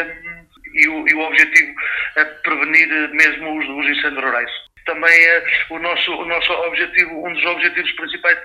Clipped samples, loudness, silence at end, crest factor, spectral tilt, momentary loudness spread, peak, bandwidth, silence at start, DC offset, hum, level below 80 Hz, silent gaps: under 0.1%; -14 LUFS; 0 s; 18 dB; -2 dB/octave; 12 LU; 0 dBFS; 16 kHz; 0 s; under 0.1%; none; -54 dBFS; none